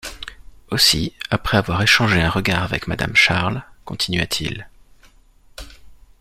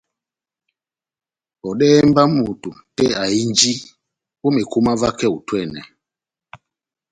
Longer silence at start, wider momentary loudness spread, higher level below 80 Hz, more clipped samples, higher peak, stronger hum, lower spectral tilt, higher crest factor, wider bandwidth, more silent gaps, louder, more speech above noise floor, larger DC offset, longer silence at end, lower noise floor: second, 0.05 s vs 1.65 s; first, 20 LU vs 17 LU; first, -40 dBFS vs -50 dBFS; neither; about the same, 0 dBFS vs 0 dBFS; neither; about the same, -3.5 dB/octave vs -4.5 dB/octave; about the same, 20 dB vs 20 dB; first, 16 kHz vs 9.6 kHz; neither; about the same, -18 LUFS vs -17 LUFS; second, 32 dB vs 72 dB; neither; second, 0.25 s vs 1.3 s; second, -50 dBFS vs -89 dBFS